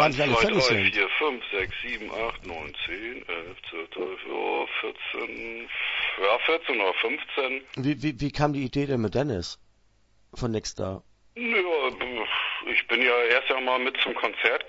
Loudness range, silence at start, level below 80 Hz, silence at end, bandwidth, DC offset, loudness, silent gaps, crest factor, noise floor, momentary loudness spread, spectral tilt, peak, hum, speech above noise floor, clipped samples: 7 LU; 0 s; -52 dBFS; 0 s; 8 kHz; under 0.1%; -26 LUFS; none; 20 dB; -62 dBFS; 13 LU; -4.5 dB/octave; -6 dBFS; none; 35 dB; under 0.1%